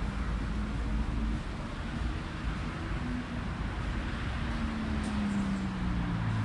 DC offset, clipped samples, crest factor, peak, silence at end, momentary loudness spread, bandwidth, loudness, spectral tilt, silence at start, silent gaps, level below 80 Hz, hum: under 0.1%; under 0.1%; 12 dB; -20 dBFS; 0 s; 5 LU; 11 kHz; -35 LUFS; -6.5 dB/octave; 0 s; none; -36 dBFS; none